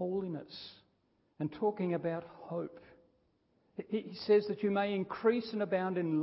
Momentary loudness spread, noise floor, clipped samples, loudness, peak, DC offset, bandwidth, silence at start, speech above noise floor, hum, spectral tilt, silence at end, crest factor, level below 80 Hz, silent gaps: 17 LU; -75 dBFS; under 0.1%; -34 LUFS; -18 dBFS; under 0.1%; 5.6 kHz; 0 s; 41 dB; none; -5.5 dB/octave; 0 s; 18 dB; -76 dBFS; none